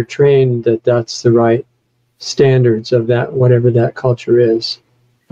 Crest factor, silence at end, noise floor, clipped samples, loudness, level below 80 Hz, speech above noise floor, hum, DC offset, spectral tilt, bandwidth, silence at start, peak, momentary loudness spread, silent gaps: 12 dB; 0.55 s; -62 dBFS; under 0.1%; -13 LUFS; -54 dBFS; 50 dB; none; under 0.1%; -7 dB/octave; 7.8 kHz; 0 s; 0 dBFS; 7 LU; none